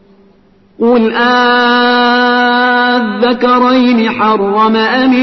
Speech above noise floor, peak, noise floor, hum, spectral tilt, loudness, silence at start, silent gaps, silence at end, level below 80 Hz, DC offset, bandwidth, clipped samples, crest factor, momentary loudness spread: 38 dB; 0 dBFS; -47 dBFS; none; -5.5 dB/octave; -9 LUFS; 0.8 s; none; 0 s; -50 dBFS; under 0.1%; 6.2 kHz; under 0.1%; 10 dB; 3 LU